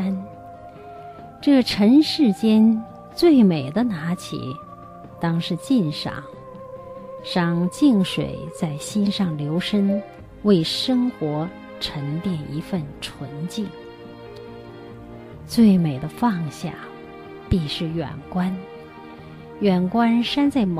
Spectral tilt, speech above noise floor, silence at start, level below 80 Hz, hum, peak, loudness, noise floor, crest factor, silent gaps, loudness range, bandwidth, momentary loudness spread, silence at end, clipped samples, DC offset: -6.5 dB/octave; 20 dB; 0 s; -48 dBFS; none; -6 dBFS; -21 LUFS; -40 dBFS; 16 dB; none; 10 LU; 14.5 kHz; 23 LU; 0 s; under 0.1%; under 0.1%